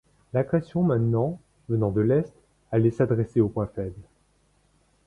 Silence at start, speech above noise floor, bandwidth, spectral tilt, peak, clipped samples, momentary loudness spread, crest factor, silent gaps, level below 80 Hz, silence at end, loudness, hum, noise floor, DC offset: 0.35 s; 41 dB; 6.6 kHz; -10.5 dB/octave; -8 dBFS; under 0.1%; 10 LU; 16 dB; none; -52 dBFS; 1.05 s; -25 LUFS; none; -65 dBFS; under 0.1%